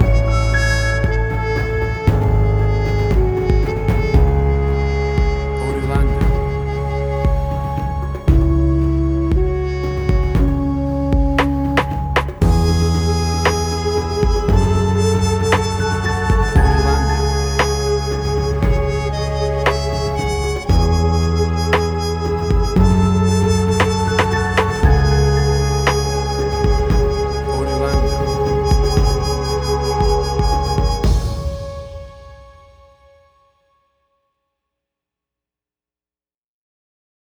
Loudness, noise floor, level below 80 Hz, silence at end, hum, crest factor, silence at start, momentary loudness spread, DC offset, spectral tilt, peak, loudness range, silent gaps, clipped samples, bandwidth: -17 LUFS; under -90 dBFS; -20 dBFS; 4.75 s; none; 16 dB; 0 s; 5 LU; under 0.1%; -6 dB/octave; 0 dBFS; 3 LU; none; under 0.1%; 13 kHz